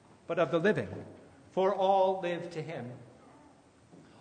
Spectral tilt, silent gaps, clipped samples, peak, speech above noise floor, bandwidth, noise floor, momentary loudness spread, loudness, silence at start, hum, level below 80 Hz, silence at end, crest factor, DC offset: -6.5 dB/octave; none; under 0.1%; -14 dBFS; 30 dB; 9.6 kHz; -60 dBFS; 19 LU; -31 LUFS; 0.3 s; none; -74 dBFS; 1.1 s; 18 dB; under 0.1%